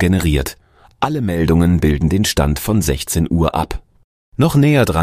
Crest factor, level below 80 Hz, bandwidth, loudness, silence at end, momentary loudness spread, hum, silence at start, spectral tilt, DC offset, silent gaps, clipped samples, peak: 14 dB; -26 dBFS; 15.5 kHz; -16 LUFS; 0 s; 9 LU; none; 0 s; -6 dB/octave; under 0.1%; 4.04-4.32 s; under 0.1%; -2 dBFS